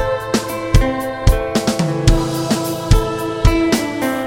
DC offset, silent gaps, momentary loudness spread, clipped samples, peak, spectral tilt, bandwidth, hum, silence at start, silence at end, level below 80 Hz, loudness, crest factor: under 0.1%; none; 4 LU; under 0.1%; 0 dBFS; -5.5 dB/octave; 17 kHz; none; 0 s; 0 s; -20 dBFS; -17 LUFS; 16 dB